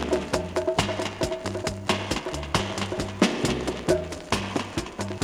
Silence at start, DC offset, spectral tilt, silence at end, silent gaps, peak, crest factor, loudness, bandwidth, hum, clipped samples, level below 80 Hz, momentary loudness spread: 0 s; under 0.1%; -4.5 dB/octave; 0 s; none; -4 dBFS; 22 dB; -27 LUFS; 16.5 kHz; none; under 0.1%; -44 dBFS; 5 LU